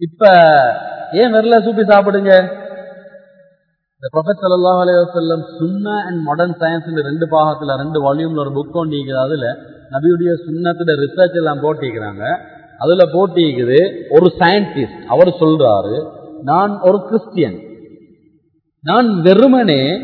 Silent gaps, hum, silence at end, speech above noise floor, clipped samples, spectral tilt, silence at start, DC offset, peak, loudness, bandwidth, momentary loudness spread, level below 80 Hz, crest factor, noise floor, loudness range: none; none; 0 s; 48 dB; 0.2%; -9.5 dB/octave; 0 s; under 0.1%; 0 dBFS; -13 LUFS; 5.4 kHz; 12 LU; -56 dBFS; 14 dB; -60 dBFS; 5 LU